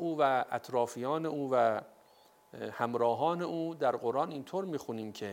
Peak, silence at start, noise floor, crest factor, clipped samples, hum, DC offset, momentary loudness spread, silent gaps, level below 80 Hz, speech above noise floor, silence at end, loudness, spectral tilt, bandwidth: -16 dBFS; 0 s; -63 dBFS; 18 dB; under 0.1%; none; under 0.1%; 10 LU; none; -82 dBFS; 31 dB; 0 s; -33 LUFS; -6 dB/octave; 16.5 kHz